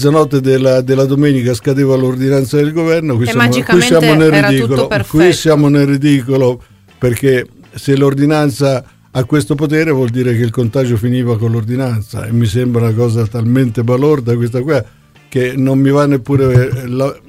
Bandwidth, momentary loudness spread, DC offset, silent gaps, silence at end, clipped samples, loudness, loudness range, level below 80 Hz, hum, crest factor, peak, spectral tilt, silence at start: 16 kHz; 7 LU; under 0.1%; none; 0.1 s; under 0.1%; -12 LUFS; 4 LU; -40 dBFS; none; 12 dB; 0 dBFS; -6.5 dB/octave; 0 s